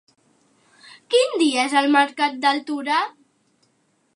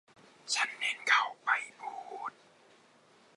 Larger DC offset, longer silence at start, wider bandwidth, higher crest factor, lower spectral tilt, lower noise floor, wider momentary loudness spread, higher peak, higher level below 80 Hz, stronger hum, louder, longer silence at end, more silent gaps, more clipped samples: neither; first, 1.1 s vs 0.45 s; about the same, 11.5 kHz vs 11.5 kHz; about the same, 18 dB vs 22 dB; first, -1.5 dB/octave vs 2 dB/octave; about the same, -66 dBFS vs -63 dBFS; second, 6 LU vs 16 LU; first, -4 dBFS vs -12 dBFS; first, -82 dBFS vs under -90 dBFS; neither; first, -20 LUFS vs -31 LUFS; about the same, 1.05 s vs 1.05 s; neither; neither